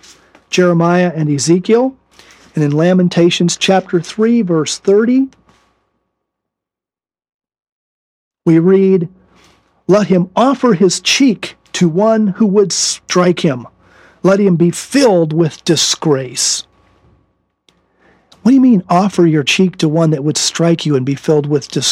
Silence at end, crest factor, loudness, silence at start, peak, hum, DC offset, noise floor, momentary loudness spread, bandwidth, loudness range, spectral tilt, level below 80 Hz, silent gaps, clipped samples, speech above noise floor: 0 s; 14 dB; -12 LUFS; 0.5 s; 0 dBFS; none; under 0.1%; -89 dBFS; 6 LU; 13.5 kHz; 4 LU; -5 dB/octave; -58 dBFS; 7.34-7.39 s, 7.72-8.31 s; under 0.1%; 78 dB